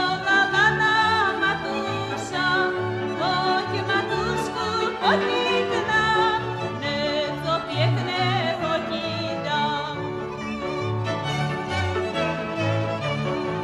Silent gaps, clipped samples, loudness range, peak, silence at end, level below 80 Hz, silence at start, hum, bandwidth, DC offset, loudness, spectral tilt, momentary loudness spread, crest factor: none; under 0.1%; 5 LU; -8 dBFS; 0 s; -50 dBFS; 0 s; none; 13 kHz; under 0.1%; -23 LUFS; -5 dB/octave; 8 LU; 16 dB